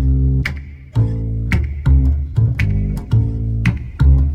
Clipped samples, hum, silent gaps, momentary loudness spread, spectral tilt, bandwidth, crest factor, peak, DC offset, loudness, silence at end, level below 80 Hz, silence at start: under 0.1%; none; none; 6 LU; -8 dB/octave; 6.8 kHz; 14 dB; -2 dBFS; under 0.1%; -18 LUFS; 0 s; -18 dBFS; 0 s